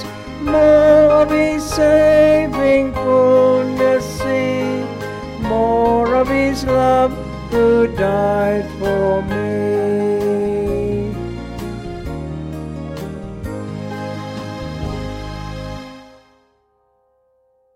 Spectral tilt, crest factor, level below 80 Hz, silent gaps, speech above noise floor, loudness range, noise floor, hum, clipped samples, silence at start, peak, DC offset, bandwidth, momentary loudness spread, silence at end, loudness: -6.5 dB/octave; 14 dB; -36 dBFS; none; 48 dB; 15 LU; -61 dBFS; none; under 0.1%; 0 s; -2 dBFS; under 0.1%; 15.5 kHz; 16 LU; 1.7 s; -16 LUFS